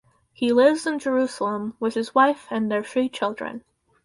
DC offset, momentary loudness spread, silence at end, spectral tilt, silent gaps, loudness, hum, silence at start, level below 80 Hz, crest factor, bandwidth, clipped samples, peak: under 0.1%; 9 LU; 0.45 s; -4.5 dB/octave; none; -23 LUFS; none; 0.4 s; -68 dBFS; 18 dB; 11.5 kHz; under 0.1%; -6 dBFS